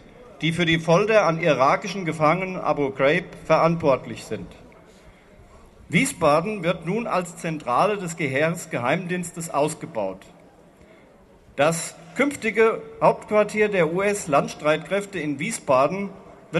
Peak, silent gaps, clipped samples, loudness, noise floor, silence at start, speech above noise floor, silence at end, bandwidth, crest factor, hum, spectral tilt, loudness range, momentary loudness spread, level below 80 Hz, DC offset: -2 dBFS; none; under 0.1%; -22 LUFS; -52 dBFS; 0.2 s; 30 dB; 0 s; 13 kHz; 20 dB; none; -5 dB/octave; 6 LU; 10 LU; -56 dBFS; under 0.1%